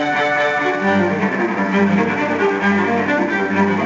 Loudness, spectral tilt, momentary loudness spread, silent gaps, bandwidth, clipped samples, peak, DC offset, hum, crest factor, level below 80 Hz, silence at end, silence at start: -17 LUFS; -6.5 dB/octave; 2 LU; none; 7.6 kHz; under 0.1%; -4 dBFS; under 0.1%; none; 14 dB; -60 dBFS; 0 s; 0 s